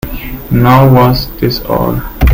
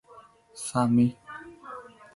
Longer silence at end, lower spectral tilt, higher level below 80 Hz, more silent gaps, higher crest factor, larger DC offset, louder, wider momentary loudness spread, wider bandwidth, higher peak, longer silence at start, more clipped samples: second, 0 s vs 0.35 s; about the same, -7.5 dB/octave vs -6.5 dB/octave; first, -20 dBFS vs -64 dBFS; neither; second, 10 dB vs 18 dB; neither; first, -10 LUFS vs -26 LUFS; second, 11 LU vs 21 LU; first, 17 kHz vs 11.5 kHz; first, 0 dBFS vs -12 dBFS; about the same, 0.05 s vs 0.15 s; first, 0.6% vs under 0.1%